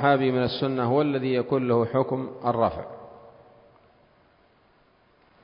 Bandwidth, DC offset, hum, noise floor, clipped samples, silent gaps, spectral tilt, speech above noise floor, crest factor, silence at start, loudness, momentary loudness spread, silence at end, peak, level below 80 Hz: 5.4 kHz; under 0.1%; none; -61 dBFS; under 0.1%; none; -11 dB/octave; 37 dB; 20 dB; 0 s; -25 LUFS; 15 LU; 2.15 s; -6 dBFS; -56 dBFS